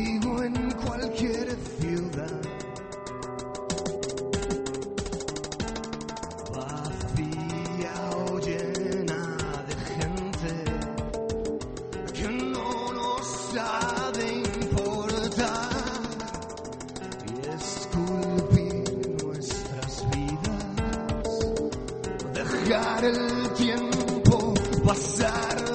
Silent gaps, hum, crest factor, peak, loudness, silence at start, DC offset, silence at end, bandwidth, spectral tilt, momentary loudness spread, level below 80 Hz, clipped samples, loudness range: none; none; 26 dB; -4 dBFS; -29 LUFS; 0 s; under 0.1%; 0 s; 8.8 kHz; -5 dB/octave; 11 LU; -42 dBFS; under 0.1%; 7 LU